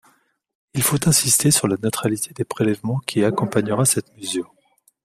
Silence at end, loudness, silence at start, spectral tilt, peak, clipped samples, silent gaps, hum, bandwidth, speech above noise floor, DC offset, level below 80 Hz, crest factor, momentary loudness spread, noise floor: 0.6 s; -19 LUFS; 0.75 s; -4 dB/octave; 0 dBFS; under 0.1%; none; none; 15.5 kHz; 40 dB; under 0.1%; -54 dBFS; 20 dB; 12 LU; -60 dBFS